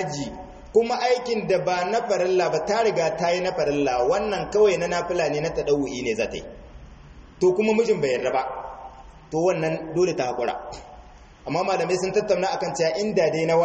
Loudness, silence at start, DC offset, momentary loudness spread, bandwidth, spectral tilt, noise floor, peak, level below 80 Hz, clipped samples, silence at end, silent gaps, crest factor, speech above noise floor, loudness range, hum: -23 LUFS; 0 s; under 0.1%; 11 LU; 8.4 kHz; -5 dB/octave; -46 dBFS; -6 dBFS; -50 dBFS; under 0.1%; 0 s; none; 16 dB; 24 dB; 4 LU; none